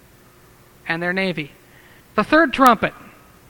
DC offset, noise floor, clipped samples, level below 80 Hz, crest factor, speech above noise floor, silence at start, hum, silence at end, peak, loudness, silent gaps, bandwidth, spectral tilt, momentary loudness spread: under 0.1%; -49 dBFS; under 0.1%; -48 dBFS; 20 dB; 32 dB; 0.85 s; none; 0.6 s; 0 dBFS; -18 LUFS; none; over 20 kHz; -5 dB/octave; 16 LU